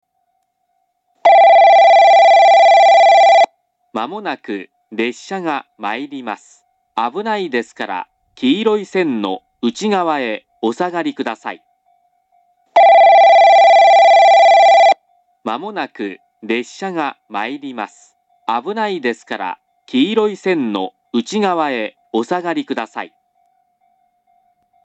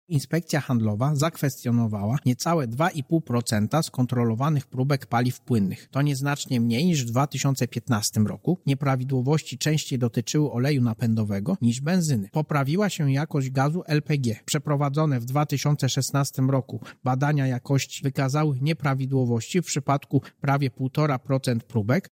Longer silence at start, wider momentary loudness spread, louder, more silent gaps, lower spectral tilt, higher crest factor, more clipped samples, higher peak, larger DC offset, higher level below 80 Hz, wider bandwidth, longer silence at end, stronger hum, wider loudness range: first, 1.25 s vs 0.1 s; first, 19 LU vs 3 LU; first, -13 LUFS vs -25 LUFS; neither; second, -4 dB/octave vs -6 dB/octave; about the same, 14 dB vs 16 dB; neither; first, 0 dBFS vs -8 dBFS; neither; second, -78 dBFS vs -62 dBFS; second, 8 kHz vs 16.5 kHz; first, 1.8 s vs 0.05 s; neither; first, 14 LU vs 1 LU